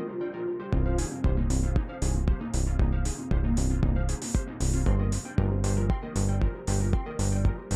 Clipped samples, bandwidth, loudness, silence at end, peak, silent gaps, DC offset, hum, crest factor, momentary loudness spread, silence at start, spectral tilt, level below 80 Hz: under 0.1%; 13 kHz; -28 LUFS; 0 s; -10 dBFS; none; under 0.1%; none; 14 dB; 4 LU; 0 s; -6.5 dB/octave; -28 dBFS